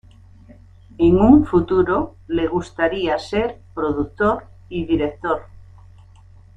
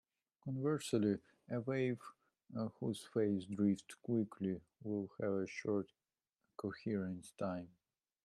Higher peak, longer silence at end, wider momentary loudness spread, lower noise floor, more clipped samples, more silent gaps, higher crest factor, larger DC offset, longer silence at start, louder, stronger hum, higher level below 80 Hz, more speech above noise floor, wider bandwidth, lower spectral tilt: first, -2 dBFS vs -22 dBFS; first, 1.15 s vs 0.6 s; about the same, 13 LU vs 11 LU; second, -46 dBFS vs -89 dBFS; neither; neither; about the same, 18 dB vs 18 dB; neither; first, 1 s vs 0.45 s; first, -19 LUFS vs -41 LUFS; neither; first, -40 dBFS vs -80 dBFS; second, 28 dB vs 50 dB; second, 8.8 kHz vs 13 kHz; about the same, -8 dB/octave vs -7 dB/octave